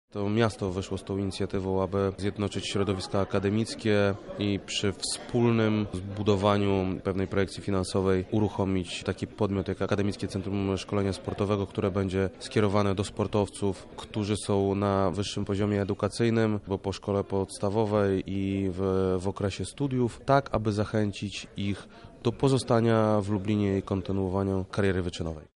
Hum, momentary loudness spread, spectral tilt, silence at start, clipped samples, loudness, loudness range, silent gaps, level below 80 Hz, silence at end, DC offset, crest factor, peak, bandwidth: none; 7 LU; -6.5 dB/octave; 0.15 s; under 0.1%; -28 LUFS; 2 LU; none; -52 dBFS; 0.1 s; under 0.1%; 20 dB; -8 dBFS; 11.5 kHz